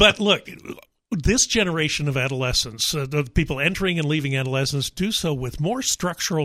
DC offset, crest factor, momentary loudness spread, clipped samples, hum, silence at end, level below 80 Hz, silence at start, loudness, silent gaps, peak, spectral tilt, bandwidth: under 0.1%; 20 dB; 7 LU; under 0.1%; none; 0 s; -38 dBFS; 0 s; -22 LUFS; none; -2 dBFS; -3.5 dB/octave; 16 kHz